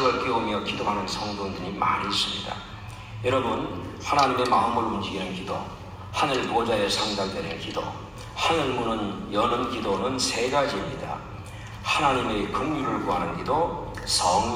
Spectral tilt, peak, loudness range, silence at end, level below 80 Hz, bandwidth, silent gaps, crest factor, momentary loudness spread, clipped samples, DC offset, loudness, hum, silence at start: -4 dB/octave; -8 dBFS; 2 LU; 0 s; -48 dBFS; 16 kHz; none; 18 dB; 12 LU; under 0.1%; under 0.1%; -26 LUFS; none; 0 s